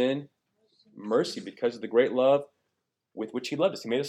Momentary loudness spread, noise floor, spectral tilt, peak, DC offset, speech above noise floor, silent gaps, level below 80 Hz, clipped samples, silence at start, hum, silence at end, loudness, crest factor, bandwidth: 13 LU; -81 dBFS; -5.5 dB/octave; -10 dBFS; under 0.1%; 54 dB; none; -84 dBFS; under 0.1%; 0 s; none; 0 s; -28 LUFS; 18 dB; 13.5 kHz